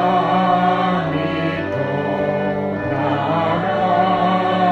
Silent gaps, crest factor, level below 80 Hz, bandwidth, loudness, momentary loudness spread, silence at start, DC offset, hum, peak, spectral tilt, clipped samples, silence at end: none; 14 dB; -50 dBFS; 8 kHz; -18 LUFS; 5 LU; 0 s; under 0.1%; none; -4 dBFS; -8 dB/octave; under 0.1%; 0 s